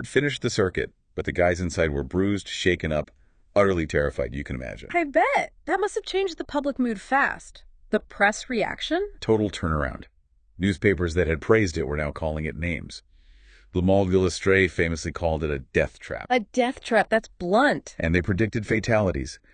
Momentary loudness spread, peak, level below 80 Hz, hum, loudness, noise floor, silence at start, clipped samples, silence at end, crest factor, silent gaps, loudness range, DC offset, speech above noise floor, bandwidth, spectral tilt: 9 LU; -6 dBFS; -42 dBFS; none; -25 LUFS; -52 dBFS; 0 s; under 0.1%; 0.2 s; 20 dB; none; 2 LU; under 0.1%; 28 dB; 10 kHz; -5.5 dB/octave